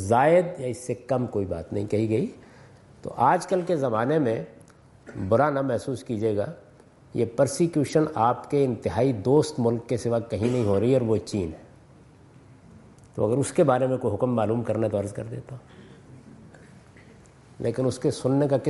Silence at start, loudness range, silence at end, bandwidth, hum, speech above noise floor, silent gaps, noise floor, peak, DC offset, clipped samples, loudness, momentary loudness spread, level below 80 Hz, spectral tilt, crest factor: 0 s; 5 LU; 0 s; 11.5 kHz; none; 29 dB; none; -52 dBFS; -8 dBFS; under 0.1%; under 0.1%; -25 LUFS; 13 LU; -60 dBFS; -7 dB/octave; 18 dB